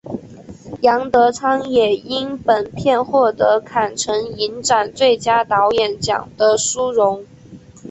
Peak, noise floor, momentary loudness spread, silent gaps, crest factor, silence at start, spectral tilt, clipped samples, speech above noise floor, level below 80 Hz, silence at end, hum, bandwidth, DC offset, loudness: -2 dBFS; -41 dBFS; 6 LU; none; 14 dB; 0.05 s; -3 dB/octave; under 0.1%; 24 dB; -52 dBFS; 0 s; none; 8.4 kHz; under 0.1%; -17 LUFS